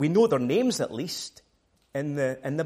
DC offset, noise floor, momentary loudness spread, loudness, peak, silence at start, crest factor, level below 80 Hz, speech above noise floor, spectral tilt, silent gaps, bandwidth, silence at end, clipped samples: under 0.1%; -68 dBFS; 13 LU; -27 LUFS; -10 dBFS; 0 s; 16 dB; -68 dBFS; 42 dB; -5.5 dB/octave; none; 15.5 kHz; 0 s; under 0.1%